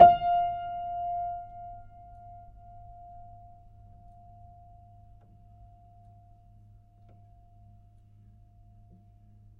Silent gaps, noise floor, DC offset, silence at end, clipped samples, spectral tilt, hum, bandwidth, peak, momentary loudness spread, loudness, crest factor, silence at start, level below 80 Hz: none; -56 dBFS; under 0.1%; 6.4 s; under 0.1%; -8.5 dB/octave; none; 3.8 kHz; -2 dBFS; 27 LU; -28 LUFS; 28 dB; 0 s; -56 dBFS